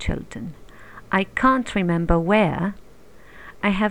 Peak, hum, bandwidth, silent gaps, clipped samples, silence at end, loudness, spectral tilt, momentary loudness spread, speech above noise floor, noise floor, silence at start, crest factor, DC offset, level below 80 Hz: -4 dBFS; none; 10.5 kHz; none; under 0.1%; 0 s; -21 LUFS; -7 dB/octave; 14 LU; 28 dB; -49 dBFS; 0 s; 20 dB; 0.5%; -36 dBFS